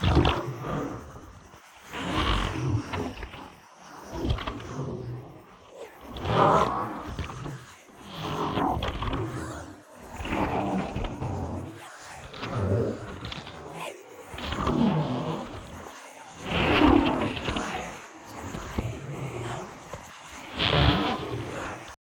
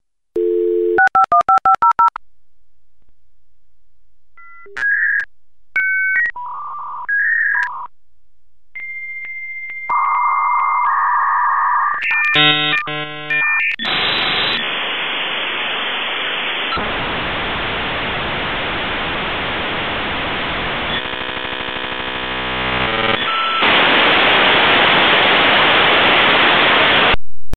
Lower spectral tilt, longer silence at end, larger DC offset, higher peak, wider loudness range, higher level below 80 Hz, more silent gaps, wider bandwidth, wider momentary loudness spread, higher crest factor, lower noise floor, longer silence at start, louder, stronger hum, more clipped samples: about the same, -6 dB/octave vs -5 dB/octave; about the same, 0.05 s vs 0 s; neither; second, -6 dBFS vs 0 dBFS; about the same, 7 LU vs 9 LU; about the same, -40 dBFS vs -42 dBFS; neither; first, 19 kHz vs 16 kHz; first, 21 LU vs 13 LU; first, 24 dB vs 16 dB; second, -50 dBFS vs -62 dBFS; second, 0 s vs 0.35 s; second, -29 LUFS vs -15 LUFS; neither; neither